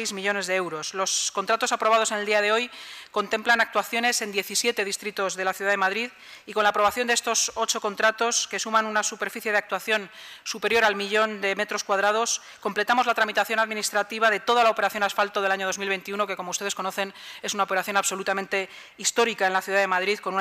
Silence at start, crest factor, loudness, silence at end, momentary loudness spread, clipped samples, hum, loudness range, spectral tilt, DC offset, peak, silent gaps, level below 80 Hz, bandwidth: 0 s; 18 dB; -24 LUFS; 0 s; 8 LU; under 0.1%; none; 3 LU; -1 dB/octave; under 0.1%; -6 dBFS; none; -70 dBFS; 15.5 kHz